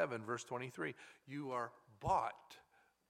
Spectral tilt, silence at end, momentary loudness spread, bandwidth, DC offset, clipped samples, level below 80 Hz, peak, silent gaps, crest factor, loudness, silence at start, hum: -5 dB/octave; 0.5 s; 20 LU; 16 kHz; under 0.1%; under 0.1%; -66 dBFS; -22 dBFS; none; 22 dB; -43 LUFS; 0 s; none